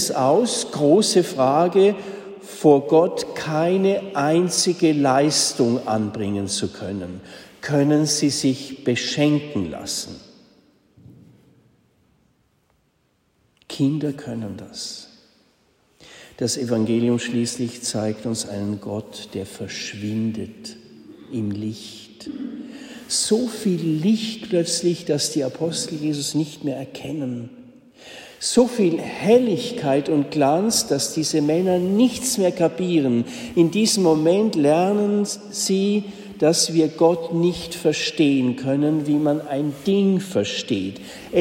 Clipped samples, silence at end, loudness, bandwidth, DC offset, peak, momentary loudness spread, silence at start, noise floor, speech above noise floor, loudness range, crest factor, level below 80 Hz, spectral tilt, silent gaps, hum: under 0.1%; 0 s; -21 LUFS; 16.5 kHz; under 0.1%; -4 dBFS; 15 LU; 0 s; -66 dBFS; 45 dB; 11 LU; 18 dB; -60 dBFS; -4.5 dB/octave; none; none